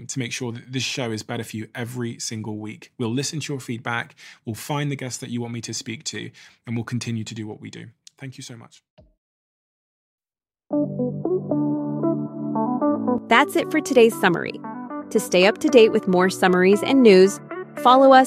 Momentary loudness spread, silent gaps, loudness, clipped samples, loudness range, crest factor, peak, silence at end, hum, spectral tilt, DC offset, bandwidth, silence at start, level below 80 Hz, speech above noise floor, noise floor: 19 LU; 8.90-8.97 s, 9.18-10.18 s; -21 LUFS; under 0.1%; 16 LU; 20 dB; 0 dBFS; 0 s; none; -5 dB/octave; under 0.1%; 15.5 kHz; 0 s; -68 dBFS; over 70 dB; under -90 dBFS